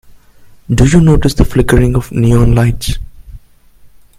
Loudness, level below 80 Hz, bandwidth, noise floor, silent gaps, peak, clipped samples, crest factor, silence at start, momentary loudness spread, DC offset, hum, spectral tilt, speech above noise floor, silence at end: -11 LUFS; -20 dBFS; 15.5 kHz; -41 dBFS; none; 0 dBFS; 0.3%; 12 dB; 0.7 s; 11 LU; under 0.1%; none; -7 dB/octave; 32 dB; 0.35 s